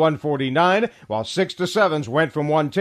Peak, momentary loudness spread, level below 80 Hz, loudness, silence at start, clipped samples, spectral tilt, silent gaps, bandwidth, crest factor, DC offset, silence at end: -4 dBFS; 7 LU; -62 dBFS; -21 LUFS; 0 s; under 0.1%; -5.5 dB/octave; none; 13.5 kHz; 16 dB; under 0.1%; 0 s